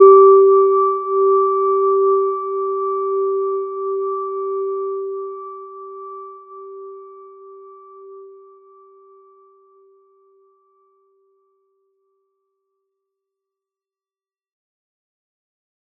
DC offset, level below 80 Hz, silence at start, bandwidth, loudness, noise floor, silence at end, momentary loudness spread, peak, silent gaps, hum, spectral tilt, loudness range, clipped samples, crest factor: under 0.1%; under -90 dBFS; 0 s; 2.4 kHz; -16 LUFS; under -90 dBFS; 7.7 s; 24 LU; -2 dBFS; none; none; -7.5 dB/octave; 24 LU; under 0.1%; 18 dB